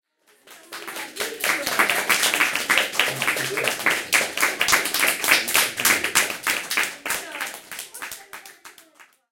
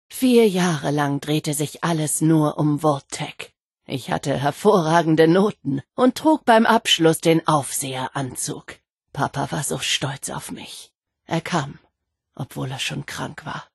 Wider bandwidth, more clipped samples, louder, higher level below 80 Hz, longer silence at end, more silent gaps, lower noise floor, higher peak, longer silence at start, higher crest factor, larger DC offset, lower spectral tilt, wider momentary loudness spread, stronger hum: first, 17 kHz vs 12.5 kHz; neither; about the same, -20 LUFS vs -20 LUFS; about the same, -62 dBFS vs -58 dBFS; first, 0.3 s vs 0.1 s; second, none vs 3.62-3.71 s, 8.92-8.97 s; second, -54 dBFS vs -73 dBFS; about the same, 0 dBFS vs -2 dBFS; first, 0.45 s vs 0.1 s; first, 24 dB vs 18 dB; neither; second, 0 dB/octave vs -4.5 dB/octave; about the same, 17 LU vs 16 LU; neither